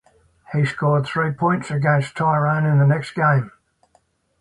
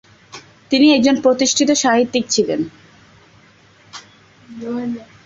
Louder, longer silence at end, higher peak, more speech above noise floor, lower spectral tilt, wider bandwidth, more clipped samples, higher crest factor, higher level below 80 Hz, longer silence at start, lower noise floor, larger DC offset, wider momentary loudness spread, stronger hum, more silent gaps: second, -19 LUFS vs -15 LUFS; first, 0.9 s vs 0.2 s; about the same, -4 dBFS vs -2 dBFS; first, 44 dB vs 34 dB; first, -8 dB/octave vs -2.5 dB/octave; first, 11 kHz vs 7.8 kHz; neither; about the same, 16 dB vs 16 dB; about the same, -56 dBFS vs -58 dBFS; first, 0.5 s vs 0.35 s; first, -62 dBFS vs -49 dBFS; neither; second, 6 LU vs 24 LU; neither; neither